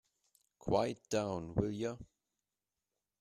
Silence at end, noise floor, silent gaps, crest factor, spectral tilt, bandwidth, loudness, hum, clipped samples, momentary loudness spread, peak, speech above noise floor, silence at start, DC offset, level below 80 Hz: 1.15 s; under -90 dBFS; none; 22 dB; -6 dB/octave; 13.5 kHz; -37 LUFS; none; under 0.1%; 10 LU; -18 dBFS; over 54 dB; 0.65 s; under 0.1%; -60 dBFS